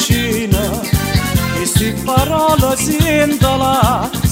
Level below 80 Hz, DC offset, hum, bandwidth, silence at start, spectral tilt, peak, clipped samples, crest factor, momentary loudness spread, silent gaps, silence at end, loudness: -26 dBFS; under 0.1%; none; 16.5 kHz; 0 s; -4.5 dB/octave; 0 dBFS; under 0.1%; 14 dB; 3 LU; none; 0 s; -14 LUFS